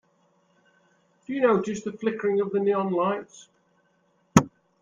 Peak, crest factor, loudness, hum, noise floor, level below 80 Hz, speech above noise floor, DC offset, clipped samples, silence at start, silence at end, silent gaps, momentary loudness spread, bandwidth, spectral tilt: -2 dBFS; 26 dB; -25 LUFS; none; -67 dBFS; -62 dBFS; 42 dB; under 0.1%; under 0.1%; 1.3 s; 0.35 s; none; 11 LU; 15.5 kHz; -6 dB/octave